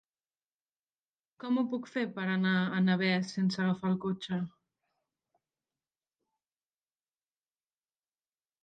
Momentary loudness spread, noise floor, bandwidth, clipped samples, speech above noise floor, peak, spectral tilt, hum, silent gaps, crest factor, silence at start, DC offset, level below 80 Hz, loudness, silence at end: 8 LU; under -90 dBFS; 8.8 kHz; under 0.1%; over 59 dB; -16 dBFS; -6.5 dB/octave; none; none; 20 dB; 1.4 s; under 0.1%; -78 dBFS; -31 LUFS; 4.15 s